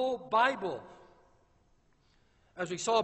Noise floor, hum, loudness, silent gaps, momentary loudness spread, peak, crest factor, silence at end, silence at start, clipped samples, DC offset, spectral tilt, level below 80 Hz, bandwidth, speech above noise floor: -68 dBFS; none; -31 LUFS; none; 16 LU; -14 dBFS; 20 dB; 0 s; 0 s; under 0.1%; under 0.1%; -3 dB/octave; -70 dBFS; 8.2 kHz; 37 dB